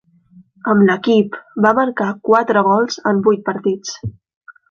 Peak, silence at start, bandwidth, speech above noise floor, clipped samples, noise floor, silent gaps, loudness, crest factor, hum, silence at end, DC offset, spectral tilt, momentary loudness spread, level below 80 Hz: -2 dBFS; 0.65 s; 7.2 kHz; 33 dB; under 0.1%; -48 dBFS; 4.36-4.41 s; -16 LUFS; 14 dB; none; 0.2 s; under 0.1%; -6 dB/octave; 12 LU; -54 dBFS